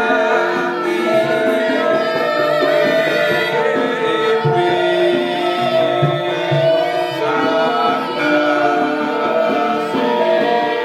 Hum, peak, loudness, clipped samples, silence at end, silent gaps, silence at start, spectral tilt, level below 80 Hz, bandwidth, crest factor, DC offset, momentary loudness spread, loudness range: none; -2 dBFS; -16 LUFS; under 0.1%; 0 s; none; 0 s; -5.5 dB/octave; -62 dBFS; 13.5 kHz; 14 dB; under 0.1%; 3 LU; 1 LU